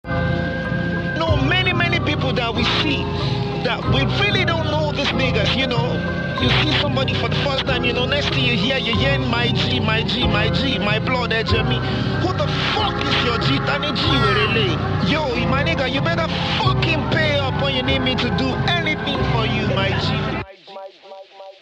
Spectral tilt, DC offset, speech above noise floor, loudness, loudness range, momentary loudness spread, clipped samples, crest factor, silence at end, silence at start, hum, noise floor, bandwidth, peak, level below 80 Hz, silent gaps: -6 dB/octave; under 0.1%; 22 dB; -19 LUFS; 1 LU; 5 LU; under 0.1%; 16 dB; 0.1 s; 0.05 s; none; -40 dBFS; 9 kHz; -4 dBFS; -34 dBFS; none